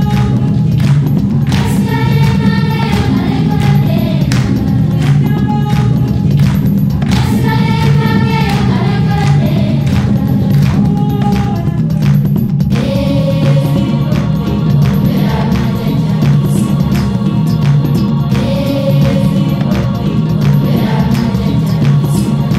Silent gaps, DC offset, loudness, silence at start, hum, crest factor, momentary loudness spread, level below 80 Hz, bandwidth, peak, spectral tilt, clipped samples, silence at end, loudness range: none; under 0.1%; -12 LUFS; 0 s; none; 10 dB; 3 LU; -26 dBFS; 13 kHz; 0 dBFS; -7.5 dB/octave; under 0.1%; 0 s; 1 LU